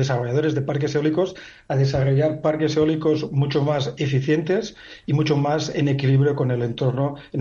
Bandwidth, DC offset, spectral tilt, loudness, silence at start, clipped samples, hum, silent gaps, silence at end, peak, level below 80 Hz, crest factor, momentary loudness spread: 7.2 kHz; under 0.1%; -7 dB/octave; -21 LUFS; 0 s; under 0.1%; none; none; 0 s; -8 dBFS; -52 dBFS; 12 dB; 6 LU